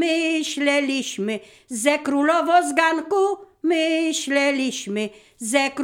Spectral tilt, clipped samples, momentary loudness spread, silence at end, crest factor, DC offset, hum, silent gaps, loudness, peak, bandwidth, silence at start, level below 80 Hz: -2.5 dB/octave; under 0.1%; 10 LU; 0 s; 18 dB; under 0.1%; none; none; -21 LUFS; -4 dBFS; 17 kHz; 0 s; -70 dBFS